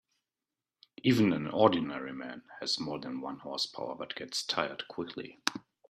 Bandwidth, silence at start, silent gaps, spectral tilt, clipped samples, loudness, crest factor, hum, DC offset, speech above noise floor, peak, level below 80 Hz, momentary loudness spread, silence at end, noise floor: 14.5 kHz; 1.05 s; none; -4.5 dB/octave; under 0.1%; -32 LUFS; 26 dB; none; under 0.1%; over 58 dB; -8 dBFS; -72 dBFS; 13 LU; 0.3 s; under -90 dBFS